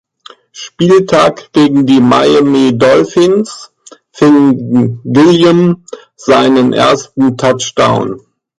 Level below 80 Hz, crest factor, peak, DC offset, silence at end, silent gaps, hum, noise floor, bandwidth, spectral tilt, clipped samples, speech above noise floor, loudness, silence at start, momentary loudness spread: -48 dBFS; 10 dB; 0 dBFS; under 0.1%; 0.4 s; none; none; -39 dBFS; 11 kHz; -6 dB/octave; under 0.1%; 30 dB; -9 LUFS; 0.55 s; 11 LU